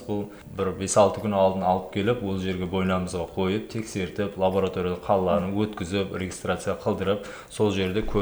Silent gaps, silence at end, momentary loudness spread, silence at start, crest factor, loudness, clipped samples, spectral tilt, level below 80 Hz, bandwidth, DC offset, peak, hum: none; 0 s; 8 LU; 0 s; 20 dB; -26 LUFS; under 0.1%; -5.5 dB/octave; -46 dBFS; over 20 kHz; under 0.1%; -6 dBFS; none